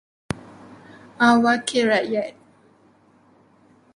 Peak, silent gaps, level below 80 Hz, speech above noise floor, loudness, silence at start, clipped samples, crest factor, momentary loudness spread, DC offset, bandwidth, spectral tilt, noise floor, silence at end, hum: -4 dBFS; none; -58 dBFS; 37 dB; -20 LUFS; 0.3 s; under 0.1%; 20 dB; 17 LU; under 0.1%; 11 kHz; -4 dB/octave; -56 dBFS; 1.65 s; none